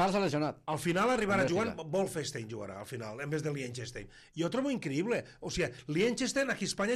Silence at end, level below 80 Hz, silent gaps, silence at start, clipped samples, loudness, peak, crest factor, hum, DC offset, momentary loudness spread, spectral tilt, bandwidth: 0 s; -60 dBFS; none; 0 s; under 0.1%; -33 LUFS; -18 dBFS; 16 dB; none; under 0.1%; 13 LU; -5 dB/octave; 15 kHz